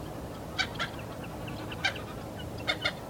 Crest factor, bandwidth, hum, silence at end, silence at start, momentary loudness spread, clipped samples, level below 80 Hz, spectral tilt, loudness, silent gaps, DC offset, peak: 22 dB; over 20 kHz; none; 0 s; 0 s; 9 LU; under 0.1%; -50 dBFS; -4 dB/octave; -35 LUFS; none; under 0.1%; -14 dBFS